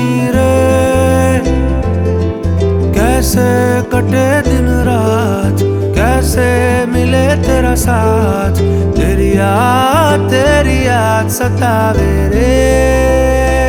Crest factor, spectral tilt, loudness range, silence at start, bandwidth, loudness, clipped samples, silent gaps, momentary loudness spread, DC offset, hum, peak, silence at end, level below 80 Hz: 10 dB; -6 dB/octave; 1 LU; 0 s; 18 kHz; -11 LUFS; under 0.1%; none; 3 LU; under 0.1%; none; 0 dBFS; 0 s; -20 dBFS